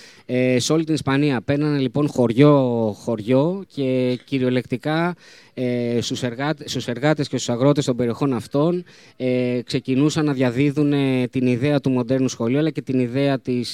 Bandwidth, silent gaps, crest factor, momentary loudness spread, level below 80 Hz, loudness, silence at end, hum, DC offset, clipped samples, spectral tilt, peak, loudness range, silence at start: 13 kHz; none; 18 dB; 6 LU; -62 dBFS; -21 LUFS; 0 s; none; 0.1%; under 0.1%; -6.5 dB/octave; -2 dBFS; 4 LU; 0.3 s